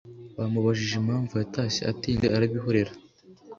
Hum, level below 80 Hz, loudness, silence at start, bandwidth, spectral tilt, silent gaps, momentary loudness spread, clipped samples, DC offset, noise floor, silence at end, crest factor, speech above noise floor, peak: none; -50 dBFS; -27 LUFS; 0.05 s; 7.6 kHz; -6 dB/octave; none; 6 LU; under 0.1%; under 0.1%; -49 dBFS; 0.05 s; 18 dB; 23 dB; -10 dBFS